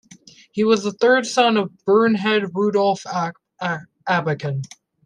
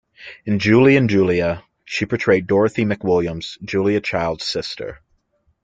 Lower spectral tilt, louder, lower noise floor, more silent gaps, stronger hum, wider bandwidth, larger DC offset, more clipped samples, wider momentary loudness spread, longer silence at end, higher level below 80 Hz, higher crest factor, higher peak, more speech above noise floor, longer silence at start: second, -5 dB/octave vs -6.5 dB/octave; about the same, -20 LUFS vs -18 LUFS; second, -48 dBFS vs -64 dBFS; neither; neither; first, 10.5 kHz vs 9 kHz; neither; neither; second, 12 LU vs 16 LU; second, 0.4 s vs 0.7 s; second, -68 dBFS vs -50 dBFS; about the same, 16 dB vs 16 dB; about the same, -4 dBFS vs -2 dBFS; second, 29 dB vs 46 dB; first, 0.55 s vs 0.2 s